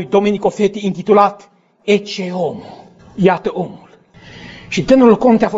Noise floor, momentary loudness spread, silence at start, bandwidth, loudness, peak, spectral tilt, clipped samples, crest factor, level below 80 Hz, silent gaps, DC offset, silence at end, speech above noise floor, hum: -42 dBFS; 21 LU; 0 s; 8 kHz; -14 LUFS; 0 dBFS; -6.5 dB/octave; under 0.1%; 16 dB; -48 dBFS; none; under 0.1%; 0 s; 28 dB; none